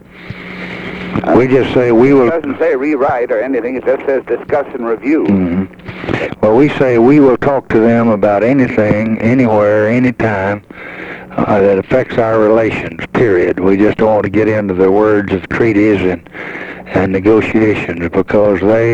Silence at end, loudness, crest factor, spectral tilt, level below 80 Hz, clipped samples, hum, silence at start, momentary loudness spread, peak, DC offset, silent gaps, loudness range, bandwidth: 0 s; -12 LUFS; 12 dB; -8.5 dB/octave; -40 dBFS; under 0.1%; none; 0.15 s; 13 LU; 0 dBFS; under 0.1%; none; 4 LU; 8.2 kHz